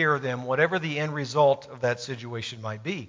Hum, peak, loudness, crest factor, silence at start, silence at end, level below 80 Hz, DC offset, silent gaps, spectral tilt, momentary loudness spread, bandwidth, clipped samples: none; -6 dBFS; -27 LUFS; 20 dB; 0 s; 0 s; -66 dBFS; under 0.1%; none; -5.5 dB/octave; 11 LU; 7.6 kHz; under 0.1%